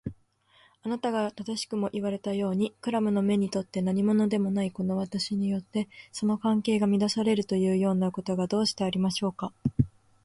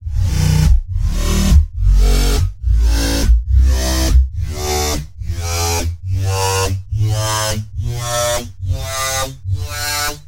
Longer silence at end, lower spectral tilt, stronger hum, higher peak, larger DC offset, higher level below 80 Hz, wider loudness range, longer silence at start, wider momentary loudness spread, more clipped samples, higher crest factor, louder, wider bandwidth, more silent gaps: first, 0.35 s vs 0 s; first, -6 dB/octave vs -4.5 dB/octave; neither; second, -10 dBFS vs 0 dBFS; neither; second, -56 dBFS vs -16 dBFS; about the same, 3 LU vs 3 LU; about the same, 0.05 s vs 0 s; about the same, 7 LU vs 8 LU; neither; about the same, 18 dB vs 14 dB; second, -28 LUFS vs -17 LUFS; second, 11.5 kHz vs 16 kHz; neither